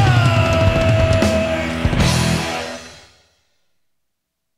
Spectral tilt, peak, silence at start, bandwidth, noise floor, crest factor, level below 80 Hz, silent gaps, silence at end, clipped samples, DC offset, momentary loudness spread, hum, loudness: -5.5 dB/octave; -2 dBFS; 0 s; 15.5 kHz; -73 dBFS; 14 dB; -30 dBFS; none; 1.6 s; under 0.1%; under 0.1%; 10 LU; none; -16 LUFS